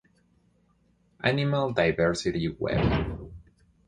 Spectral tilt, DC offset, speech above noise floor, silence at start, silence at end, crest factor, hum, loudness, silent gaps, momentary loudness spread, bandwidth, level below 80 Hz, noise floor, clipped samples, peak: -6 dB/octave; under 0.1%; 40 dB; 1.25 s; 0.45 s; 22 dB; none; -27 LUFS; none; 10 LU; 10.5 kHz; -42 dBFS; -66 dBFS; under 0.1%; -6 dBFS